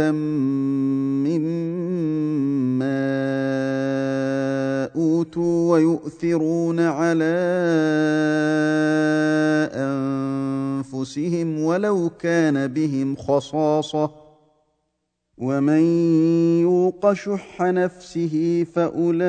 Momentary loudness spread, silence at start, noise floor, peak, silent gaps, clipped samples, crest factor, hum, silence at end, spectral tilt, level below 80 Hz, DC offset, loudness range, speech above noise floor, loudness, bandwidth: 7 LU; 0 s; -75 dBFS; -6 dBFS; none; under 0.1%; 16 dB; none; 0 s; -7.5 dB/octave; -62 dBFS; under 0.1%; 3 LU; 55 dB; -21 LUFS; 9.2 kHz